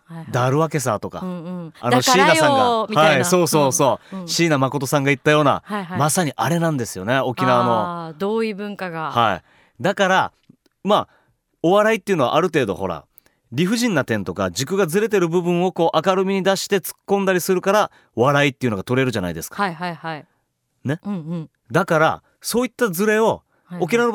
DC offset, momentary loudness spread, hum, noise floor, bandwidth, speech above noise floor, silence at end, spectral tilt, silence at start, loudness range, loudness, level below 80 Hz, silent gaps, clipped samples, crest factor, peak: under 0.1%; 12 LU; none; -70 dBFS; 19 kHz; 51 dB; 0 s; -4.5 dB/octave; 0.1 s; 6 LU; -19 LUFS; -58 dBFS; none; under 0.1%; 16 dB; -4 dBFS